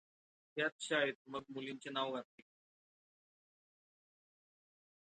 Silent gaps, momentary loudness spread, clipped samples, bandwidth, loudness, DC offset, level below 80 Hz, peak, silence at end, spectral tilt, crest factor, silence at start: 0.72-0.79 s, 1.15-1.25 s; 12 LU; under 0.1%; 9 kHz; -40 LUFS; under 0.1%; -90 dBFS; -22 dBFS; 2.8 s; -3 dB/octave; 24 dB; 0.55 s